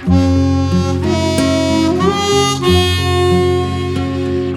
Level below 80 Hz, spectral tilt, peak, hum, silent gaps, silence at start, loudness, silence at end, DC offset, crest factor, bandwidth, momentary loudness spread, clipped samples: -32 dBFS; -5.5 dB/octave; -2 dBFS; none; none; 0 s; -14 LUFS; 0 s; under 0.1%; 12 dB; 14 kHz; 6 LU; under 0.1%